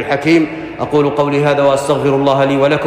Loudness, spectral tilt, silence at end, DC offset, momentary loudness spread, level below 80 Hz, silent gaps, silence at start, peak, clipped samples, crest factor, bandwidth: -13 LUFS; -6.5 dB/octave; 0 s; under 0.1%; 4 LU; -46 dBFS; none; 0 s; -2 dBFS; under 0.1%; 10 dB; 15.5 kHz